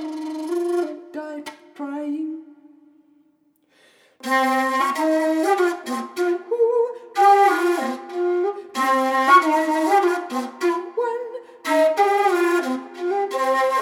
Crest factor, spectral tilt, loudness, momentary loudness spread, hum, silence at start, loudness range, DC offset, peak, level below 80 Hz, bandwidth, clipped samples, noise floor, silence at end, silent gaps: 18 dB; -2.5 dB/octave; -20 LUFS; 15 LU; none; 0 s; 11 LU; under 0.1%; -4 dBFS; -88 dBFS; 17 kHz; under 0.1%; -62 dBFS; 0 s; none